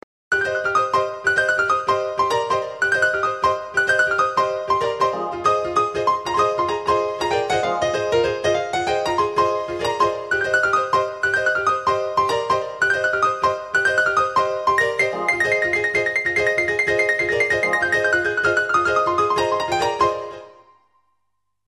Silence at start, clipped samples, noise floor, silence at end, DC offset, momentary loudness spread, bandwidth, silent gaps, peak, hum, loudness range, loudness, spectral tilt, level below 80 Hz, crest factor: 0.3 s; under 0.1%; -76 dBFS; 1.15 s; under 0.1%; 4 LU; 13 kHz; none; -6 dBFS; none; 2 LU; -19 LUFS; -3.5 dB/octave; -52 dBFS; 14 dB